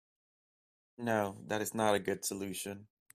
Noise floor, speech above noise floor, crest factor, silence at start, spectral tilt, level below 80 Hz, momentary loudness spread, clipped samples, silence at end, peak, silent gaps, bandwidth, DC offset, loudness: under -90 dBFS; over 55 dB; 22 dB; 1 s; -4 dB/octave; -74 dBFS; 10 LU; under 0.1%; 0.3 s; -14 dBFS; none; 16 kHz; under 0.1%; -35 LUFS